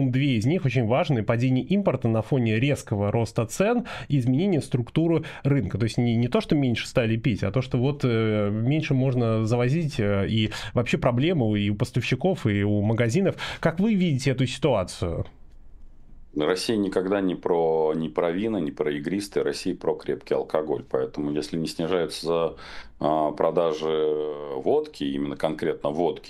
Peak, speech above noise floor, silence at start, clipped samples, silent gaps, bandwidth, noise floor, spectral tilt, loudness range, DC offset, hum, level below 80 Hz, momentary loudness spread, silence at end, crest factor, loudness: -6 dBFS; 20 dB; 0 s; under 0.1%; none; 13 kHz; -44 dBFS; -7 dB/octave; 3 LU; under 0.1%; none; -48 dBFS; 5 LU; 0 s; 18 dB; -25 LUFS